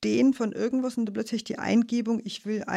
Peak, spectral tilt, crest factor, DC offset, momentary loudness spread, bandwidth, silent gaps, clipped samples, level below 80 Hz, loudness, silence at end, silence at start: -12 dBFS; -5.5 dB/octave; 14 dB; under 0.1%; 8 LU; 11 kHz; none; under 0.1%; -68 dBFS; -27 LUFS; 0 s; 0 s